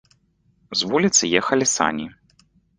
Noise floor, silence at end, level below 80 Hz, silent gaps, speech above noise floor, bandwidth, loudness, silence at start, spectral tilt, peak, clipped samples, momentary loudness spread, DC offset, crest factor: -63 dBFS; 0.7 s; -58 dBFS; none; 43 dB; 10 kHz; -19 LUFS; 0.7 s; -2.5 dB/octave; -2 dBFS; under 0.1%; 12 LU; under 0.1%; 22 dB